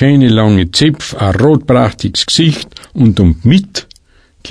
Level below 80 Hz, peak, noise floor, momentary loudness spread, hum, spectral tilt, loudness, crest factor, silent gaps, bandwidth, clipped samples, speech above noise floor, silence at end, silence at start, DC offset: -30 dBFS; 0 dBFS; -47 dBFS; 9 LU; none; -6 dB/octave; -10 LUFS; 10 dB; none; 11 kHz; under 0.1%; 37 dB; 0 s; 0 s; under 0.1%